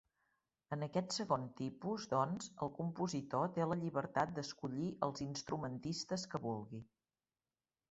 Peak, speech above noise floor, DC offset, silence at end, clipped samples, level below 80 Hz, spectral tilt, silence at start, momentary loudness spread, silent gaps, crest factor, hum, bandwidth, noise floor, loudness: -20 dBFS; over 49 dB; under 0.1%; 1.05 s; under 0.1%; -74 dBFS; -5.5 dB/octave; 0.7 s; 7 LU; none; 22 dB; none; 8 kHz; under -90 dBFS; -41 LUFS